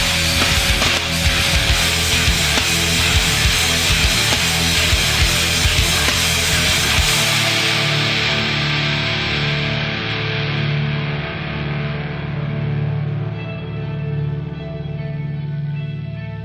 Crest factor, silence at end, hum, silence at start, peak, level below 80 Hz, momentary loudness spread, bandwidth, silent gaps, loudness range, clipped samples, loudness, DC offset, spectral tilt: 16 dB; 0 s; none; 0 s; -2 dBFS; -28 dBFS; 11 LU; 16 kHz; none; 10 LU; under 0.1%; -16 LUFS; under 0.1%; -3 dB/octave